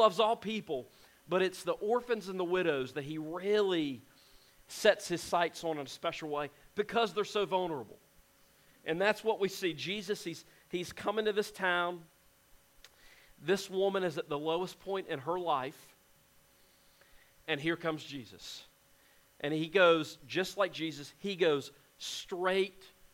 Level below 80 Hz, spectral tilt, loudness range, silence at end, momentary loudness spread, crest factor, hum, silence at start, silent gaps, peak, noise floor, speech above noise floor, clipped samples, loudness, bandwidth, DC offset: -70 dBFS; -4 dB/octave; 6 LU; 0.1 s; 12 LU; 24 dB; none; 0 s; none; -10 dBFS; -65 dBFS; 32 dB; under 0.1%; -34 LUFS; 16.5 kHz; under 0.1%